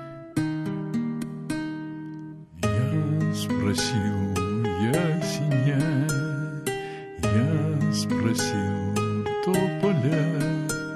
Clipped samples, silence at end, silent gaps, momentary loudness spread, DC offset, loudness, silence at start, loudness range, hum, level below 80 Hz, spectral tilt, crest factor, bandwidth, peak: under 0.1%; 0 s; none; 9 LU; under 0.1%; -26 LUFS; 0 s; 3 LU; none; -48 dBFS; -6 dB/octave; 16 dB; 15 kHz; -10 dBFS